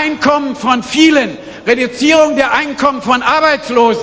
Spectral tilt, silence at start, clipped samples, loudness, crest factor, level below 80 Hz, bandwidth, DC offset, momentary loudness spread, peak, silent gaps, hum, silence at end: -3.5 dB/octave; 0 s; 0.2%; -12 LUFS; 12 dB; -46 dBFS; 8 kHz; under 0.1%; 5 LU; 0 dBFS; none; none; 0 s